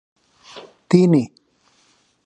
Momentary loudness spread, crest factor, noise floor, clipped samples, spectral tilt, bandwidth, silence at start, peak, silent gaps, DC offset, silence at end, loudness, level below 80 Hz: 26 LU; 20 dB; -60 dBFS; under 0.1%; -8 dB/octave; 9.2 kHz; 0.55 s; -2 dBFS; none; under 0.1%; 1 s; -16 LUFS; -66 dBFS